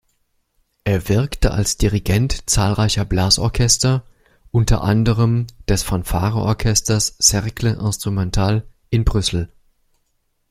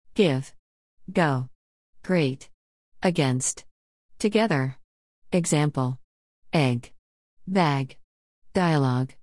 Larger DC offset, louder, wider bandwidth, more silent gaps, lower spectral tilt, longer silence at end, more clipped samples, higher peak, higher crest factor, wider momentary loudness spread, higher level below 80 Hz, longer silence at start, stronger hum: second, under 0.1% vs 0.2%; first, -18 LUFS vs -25 LUFS; first, 15.5 kHz vs 12 kHz; second, none vs 0.59-0.97 s, 1.55-1.93 s, 2.54-2.92 s, 3.71-4.09 s, 4.84-5.22 s, 6.04-6.42 s, 6.99-7.37 s, 8.04-8.42 s; about the same, -4.5 dB/octave vs -5.5 dB/octave; first, 1.05 s vs 0.15 s; neither; first, 0 dBFS vs -6 dBFS; about the same, 18 dB vs 20 dB; second, 7 LU vs 15 LU; first, -28 dBFS vs -60 dBFS; first, 0.85 s vs 0.15 s; neither